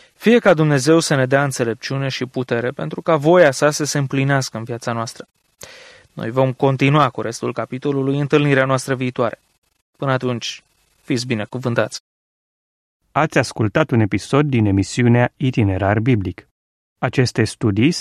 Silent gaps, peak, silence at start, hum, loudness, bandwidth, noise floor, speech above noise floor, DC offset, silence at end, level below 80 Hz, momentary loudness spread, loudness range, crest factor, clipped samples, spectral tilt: 9.58-9.62 s, 9.81-9.93 s, 12.00-13.00 s, 16.51-16.96 s; -2 dBFS; 0.2 s; none; -18 LUFS; 14.5 kHz; under -90 dBFS; over 73 dB; under 0.1%; 0 s; -54 dBFS; 11 LU; 6 LU; 16 dB; under 0.1%; -6 dB/octave